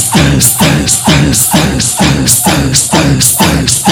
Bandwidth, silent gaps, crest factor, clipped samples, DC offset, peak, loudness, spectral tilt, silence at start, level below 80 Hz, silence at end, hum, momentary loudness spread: over 20 kHz; none; 8 dB; 2%; under 0.1%; 0 dBFS; -7 LUFS; -3.5 dB/octave; 0 s; -24 dBFS; 0 s; none; 2 LU